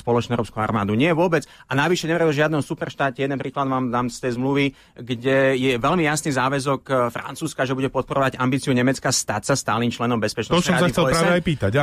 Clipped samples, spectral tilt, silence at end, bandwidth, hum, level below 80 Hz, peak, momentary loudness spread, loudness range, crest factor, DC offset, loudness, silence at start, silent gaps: under 0.1%; -5 dB/octave; 0 s; 15 kHz; none; -48 dBFS; -8 dBFS; 7 LU; 2 LU; 14 dB; under 0.1%; -21 LUFS; 0.05 s; none